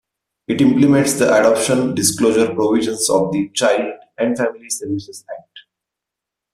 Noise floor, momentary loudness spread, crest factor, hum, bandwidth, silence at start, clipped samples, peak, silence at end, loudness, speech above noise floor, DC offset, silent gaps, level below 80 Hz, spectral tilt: -84 dBFS; 13 LU; 16 dB; none; 14.5 kHz; 0.5 s; under 0.1%; -2 dBFS; 0.95 s; -16 LUFS; 67 dB; under 0.1%; none; -56 dBFS; -4.5 dB/octave